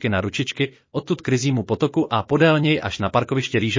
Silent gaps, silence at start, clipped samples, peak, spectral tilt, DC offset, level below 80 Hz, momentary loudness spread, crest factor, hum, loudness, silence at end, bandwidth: none; 0 s; under 0.1%; -4 dBFS; -6 dB/octave; under 0.1%; -46 dBFS; 8 LU; 16 dB; none; -21 LUFS; 0 s; 7.6 kHz